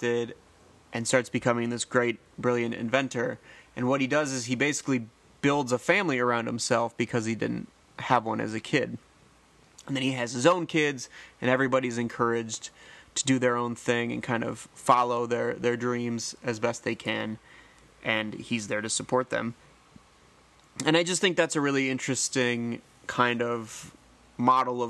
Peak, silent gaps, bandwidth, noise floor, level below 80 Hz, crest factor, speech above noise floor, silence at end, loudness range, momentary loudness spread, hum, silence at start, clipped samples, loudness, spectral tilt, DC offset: -6 dBFS; none; 12.5 kHz; -59 dBFS; -66 dBFS; 22 dB; 31 dB; 0 s; 4 LU; 12 LU; none; 0 s; under 0.1%; -28 LUFS; -4 dB/octave; under 0.1%